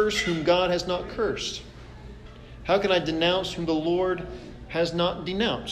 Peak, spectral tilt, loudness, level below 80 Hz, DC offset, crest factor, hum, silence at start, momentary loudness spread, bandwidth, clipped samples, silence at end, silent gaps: -8 dBFS; -4.5 dB/octave; -25 LUFS; -46 dBFS; under 0.1%; 18 dB; none; 0 s; 22 LU; 14 kHz; under 0.1%; 0 s; none